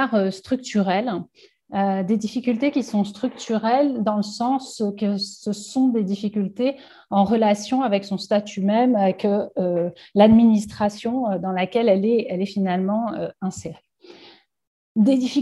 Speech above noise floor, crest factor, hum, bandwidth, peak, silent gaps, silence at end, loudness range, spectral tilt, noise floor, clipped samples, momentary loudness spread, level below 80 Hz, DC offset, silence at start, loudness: 30 dB; 18 dB; none; 11.5 kHz; -2 dBFS; 14.67-14.95 s; 0 s; 4 LU; -6.5 dB/octave; -51 dBFS; under 0.1%; 9 LU; -58 dBFS; under 0.1%; 0 s; -21 LUFS